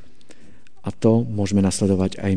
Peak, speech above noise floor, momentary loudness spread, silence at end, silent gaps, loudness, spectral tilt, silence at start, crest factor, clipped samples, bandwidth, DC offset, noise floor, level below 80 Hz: -4 dBFS; 33 dB; 10 LU; 0 s; none; -20 LUFS; -6.5 dB/octave; 0.85 s; 18 dB; under 0.1%; 10 kHz; 2%; -52 dBFS; -52 dBFS